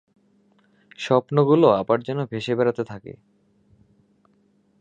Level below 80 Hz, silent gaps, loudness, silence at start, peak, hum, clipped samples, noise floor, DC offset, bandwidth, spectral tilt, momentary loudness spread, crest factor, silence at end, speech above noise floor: -64 dBFS; none; -21 LUFS; 1 s; -4 dBFS; none; under 0.1%; -62 dBFS; under 0.1%; 9 kHz; -7.5 dB/octave; 17 LU; 20 dB; 1.7 s; 42 dB